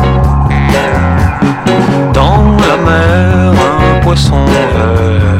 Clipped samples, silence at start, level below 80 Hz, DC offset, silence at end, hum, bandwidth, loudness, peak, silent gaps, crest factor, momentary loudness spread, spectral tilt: 0.9%; 0 s; -16 dBFS; under 0.1%; 0 s; none; 13.5 kHz; -9 LUFS; 0 dBFS; none; 8 dB; 3 LU; -7 dB/octave